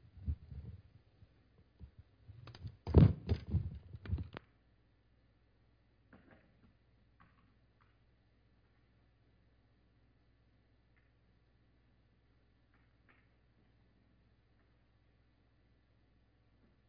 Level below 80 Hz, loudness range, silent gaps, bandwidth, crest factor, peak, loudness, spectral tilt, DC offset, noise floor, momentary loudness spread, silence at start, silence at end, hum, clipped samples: -50 dBFS; 16 LU; none; 5.2 kHz; 30 dB; -12 dBFS; -35 LUFS; -9.5 dB/octave; under 0.1%; -71 dBFS; 27 LU; 0.15 s; 12.5 s; none; under 0.1%